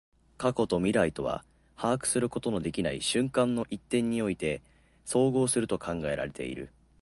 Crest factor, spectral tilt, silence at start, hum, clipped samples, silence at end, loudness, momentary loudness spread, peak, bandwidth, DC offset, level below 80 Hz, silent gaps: 18 dB; -4.5 dB/octave; 0.4 s; none; under 0.1%; 0.35 s; -30 LUFS; 11 LU; -12 dBFS; 12 kHz; under 0.1%; -54 dBFS; none